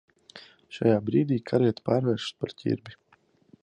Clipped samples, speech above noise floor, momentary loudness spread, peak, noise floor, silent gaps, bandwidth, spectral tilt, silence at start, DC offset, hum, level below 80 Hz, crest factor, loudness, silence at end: under 0.1%; 38 dB; 15 LU; -8 dBFS; -64 dBFS; none; 9.6 kHz; -7.5 dB/octave; 0.35 s; under 0.1%; none; -62 dBFS; 18 dB; -27 LUFS; 0.7 s